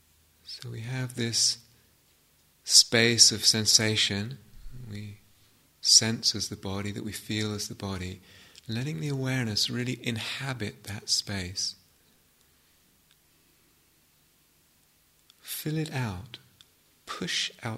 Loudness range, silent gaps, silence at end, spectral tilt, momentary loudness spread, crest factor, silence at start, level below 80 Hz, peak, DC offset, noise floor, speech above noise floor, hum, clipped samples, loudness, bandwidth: 16 LU; none; 0 s; -2 dB/octave; 23 LU; 26 dB; 0.45 s; -60 dBFS; -4 dBFS; under 0.1%; -65 dBFS; 37 dB; none; under 0.1%; -25 LUFS; 16 kHz